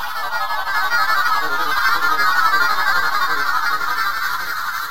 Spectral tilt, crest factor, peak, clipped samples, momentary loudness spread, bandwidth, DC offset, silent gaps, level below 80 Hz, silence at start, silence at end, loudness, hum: -0.5 dB/octave; 14 dB; -4 dBFS; under 0.1%; 7 LU; 16 kHz; 8%; none; -50 dBFS; 0 s; 0 s; -18 LUFS; none